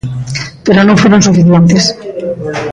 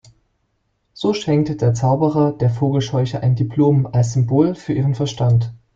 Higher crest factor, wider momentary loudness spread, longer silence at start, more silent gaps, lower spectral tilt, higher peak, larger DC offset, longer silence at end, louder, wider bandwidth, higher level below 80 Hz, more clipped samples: second, 8 dB vs 16 dB; first, 13 LU vs 4 LU; second, 0.05 s vs 0.95 s; neither; second, -5.5 dB/octave vs -7.5 dB/octave; about the same, 0 dBFS vs -2 dBFS; neither; second, 0 s vs 0.2 s; first, -8 LUFS vs -18 LUFS; first, 9.8 kHz vs 7.6 kHz; first, -38 dBFS vs -48 dBFS; neither